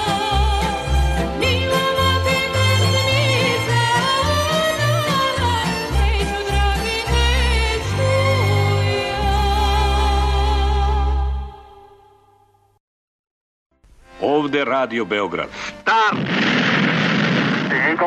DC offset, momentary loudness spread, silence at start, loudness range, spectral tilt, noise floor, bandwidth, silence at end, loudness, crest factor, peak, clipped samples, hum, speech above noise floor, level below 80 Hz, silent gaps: under 0.1%; 5 LU; 0 s; 8 LU; -5 dB/octave; -56 dBFS; 13.5 kHz; 0 s; -18 LUFS; 12 dB; -6 dBFS; under 0.1%; none; 37 dB; -24 dBFS; 12.80-13.24 s, 13.31-13.70 s